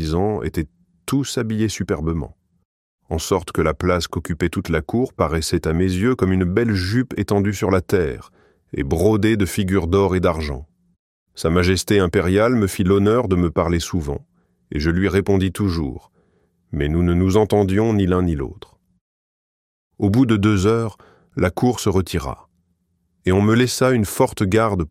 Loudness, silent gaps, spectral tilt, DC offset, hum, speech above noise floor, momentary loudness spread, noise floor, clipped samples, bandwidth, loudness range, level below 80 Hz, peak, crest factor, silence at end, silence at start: -19 LUFS; 2.65-2.98 s, 10.99-11.26 s, 19.01-19.91 s; -6 dB/octave; under 0.1%; none; 49 dB; 11 LU; -67 dBFS; under 0.1%; 16 kHz; 4 LU; -36 dBFS; -2 dBFS; 16 dB; 0 s; 0 s